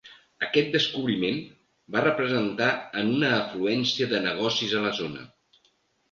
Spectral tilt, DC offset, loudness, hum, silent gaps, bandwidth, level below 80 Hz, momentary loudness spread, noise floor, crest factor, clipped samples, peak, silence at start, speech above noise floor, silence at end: -5 dB/octave; under 0.1%; -25 LUFS; none; none; 7.4 kHz; -66 dBFS; 7 LU; -68 dBFS; 20 dB; under 0.1%; -8 dBFS; 0.05 s; 42 dB; 0.85 s